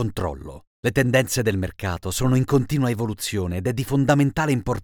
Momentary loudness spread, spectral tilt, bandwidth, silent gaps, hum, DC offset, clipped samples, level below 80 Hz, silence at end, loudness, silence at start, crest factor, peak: 9 LU; -5.5 dB/octave; 19.5 kHz; 0.67-0.83 s; none; under 0.1%; under 0.1%; -44 dBFS; 0 s; -22 LUFS; 0 s; 18 dB; -4 dBFS